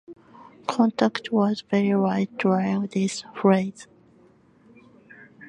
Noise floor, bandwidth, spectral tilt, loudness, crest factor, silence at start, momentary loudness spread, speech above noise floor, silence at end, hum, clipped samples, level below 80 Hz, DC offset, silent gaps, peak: -56 dBFS; 10.5 kHz; -6.5 dB/octave; -23 LUFS; 20 dB; 0.1 s; 7 LU; 34 dB; 0 s; none; under 0.1%; -70 dBFS; under 0.1%; none; -4 dBFS